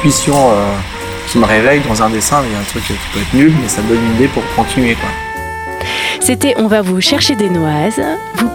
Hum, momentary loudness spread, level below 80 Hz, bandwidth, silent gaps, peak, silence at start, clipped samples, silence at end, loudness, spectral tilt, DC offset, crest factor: none; 9 LU; -30 dBFS; 19.5 kHz; none; 0 dBFS; 0 s; under 0.1%; 0 s; -12 LUFS; -4 dB/octave; under 0.1%; 12 dB